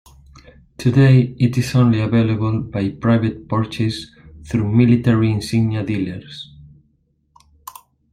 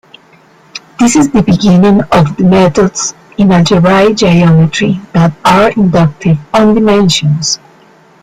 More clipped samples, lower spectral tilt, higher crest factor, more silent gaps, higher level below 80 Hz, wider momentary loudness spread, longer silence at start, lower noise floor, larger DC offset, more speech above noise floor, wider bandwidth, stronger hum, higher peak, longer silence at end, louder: neither; first, -7.5 dB/octave vs -5.5 dB/octave; first, 16 dB vs 8 dB; neither; second, -46 dBFS vs -36 dBFS; first, 20 LU vs 6 LU; about the same, 0.8 s vs 0.75 s; first, -62 dBFS vs -43 dBFS; neither; first, 46 dB vs 35 dB; first, 14.5 kHz vs 12 kHz; neither; about the same, -2 dBFS vs 0 dBFS; first, 1.5 s vs 0.65 s; second, -17 LUFS vs -8 LUFS